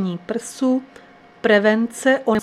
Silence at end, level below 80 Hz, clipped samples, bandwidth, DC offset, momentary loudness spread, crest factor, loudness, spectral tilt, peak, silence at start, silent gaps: 0 s; -60 dBFS; under 0.1%; 14 kHz; under 0.1%; 10 LU; 16 dB; -19 LUFS; -5 dB/octave; -2 dBFS; 0 s; none